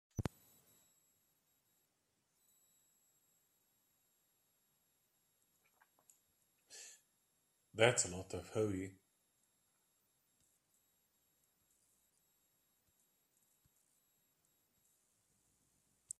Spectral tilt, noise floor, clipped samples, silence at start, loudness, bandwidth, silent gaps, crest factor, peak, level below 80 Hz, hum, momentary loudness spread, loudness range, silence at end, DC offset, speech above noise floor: -3.5 dB/octave; -83 dBFS; under 0.1%; 0.15 s; -38 LUFS; 14.5 kHz; none; 34 dB; -16 dBFS; -74 dBFS; none; 23 LU; 14 LU; 7.3 s; under 0.1%; 46 dB